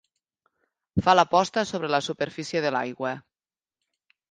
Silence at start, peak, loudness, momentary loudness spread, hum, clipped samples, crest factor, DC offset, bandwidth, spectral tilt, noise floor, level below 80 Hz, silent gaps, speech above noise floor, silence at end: 0.95 s; -4 dBFS; -25 LUFS; 12 LU; none; under 0.1%; 22 dB; under 0.1%; 9.6 kHz; -4.5 dB/octave; under -90 dBFS; -56 dBFS; none; over 66 dB; 1.1 s